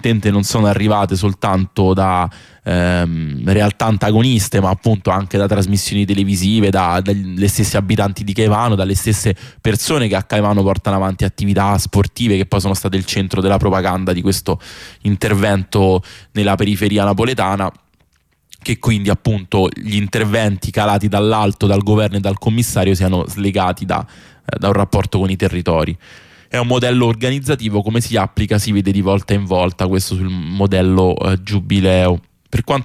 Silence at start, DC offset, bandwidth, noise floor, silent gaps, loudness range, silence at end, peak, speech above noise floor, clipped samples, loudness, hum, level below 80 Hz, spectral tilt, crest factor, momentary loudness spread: 0.05 s; under 0.1%; 15.5 kHz; -59 dBFS; none; 2 LU; 0 s; -4 dBFS; 44 dB; under 0.1%; -16 LUFS; none; -36 dBFS; -6 dB/octave; 12 dB; 6 LU